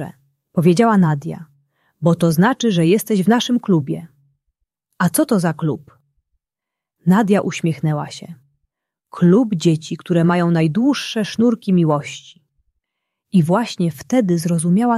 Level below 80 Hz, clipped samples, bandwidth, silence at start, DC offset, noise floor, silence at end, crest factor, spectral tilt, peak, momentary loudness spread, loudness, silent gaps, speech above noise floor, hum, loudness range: -60 dBFS; under 0.1%; 14 kHz; 0 s; under 0.1%; -85 dBFS; 0 s; 16 dB; -6.5 dB/octave; -2 dBFS; 11 LU; -17 LUFS; none; 69 dB; none; 5 LU